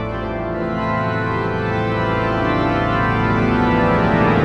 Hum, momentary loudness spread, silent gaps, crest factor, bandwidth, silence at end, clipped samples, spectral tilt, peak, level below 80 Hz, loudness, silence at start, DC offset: none; 7 LU; none; 16 dB; 8.2 kHz; 0 s; under 0.1%; -8 dB/octave; -2 dBFS; -34 dBFS; -18 LUFS; 0 s; under 0.1%